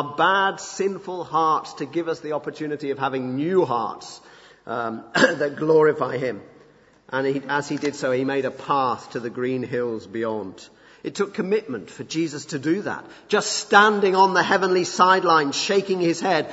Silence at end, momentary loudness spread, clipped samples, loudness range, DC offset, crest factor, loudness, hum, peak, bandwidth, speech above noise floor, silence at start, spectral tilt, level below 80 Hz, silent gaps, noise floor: 0 s; 13 LU; under 0.1%; 9 LU; under 0.1%; 22 dB; -22 LUFS; none; -2 dBFS; 8 kHz; 31 dB; 0 s; -4 dB/octave; -68 dBFS; none; -54 dBFS